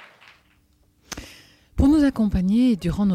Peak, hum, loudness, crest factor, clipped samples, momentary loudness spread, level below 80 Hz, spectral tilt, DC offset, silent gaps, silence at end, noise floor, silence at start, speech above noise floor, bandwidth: -6 dBFS; none; -20 LUFS; 16 dB; under 0.1%; 19 LU; -34 dBFS; -7 dB/octave; under 0.1%; none; 0 s; -61 dBFS; 1.1 s; 41 dB; 14.5 kHz